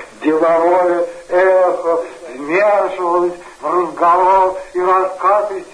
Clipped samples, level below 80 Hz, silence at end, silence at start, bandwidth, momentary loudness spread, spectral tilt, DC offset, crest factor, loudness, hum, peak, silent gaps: under 0.1%; -54 dBFS; 0 s; 0 s; 10.5 kHz; 7 LU; -5.5 dB/octave; under 0.1%; 12 dB; -14 LUFS; none; -2 dBFS; none